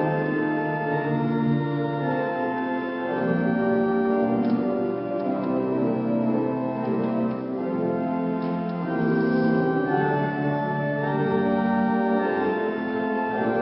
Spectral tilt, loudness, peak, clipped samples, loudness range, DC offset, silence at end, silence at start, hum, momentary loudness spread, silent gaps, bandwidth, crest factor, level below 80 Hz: -12 dB/octave; -24 LUFS; -10 dBFS; under 0.1%; 2 LU; under 0.1%; 0 s; 0 s; none; 4 LU; none; 5.6 kHz; 14 dB; -60 dBFS